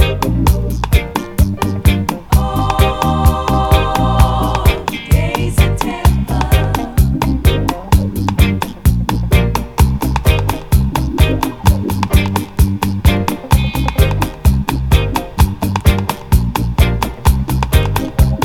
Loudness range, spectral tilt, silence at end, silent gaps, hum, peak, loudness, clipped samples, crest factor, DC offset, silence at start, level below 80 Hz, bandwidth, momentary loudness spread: 1 LU; -6 dB/octave; 0 s; none; none; 0 dBFS; -15 LUFS; 0.1%; 12 dB; under 0.1%; 0 s; -16 dBFS; 18 kHz; 3 LU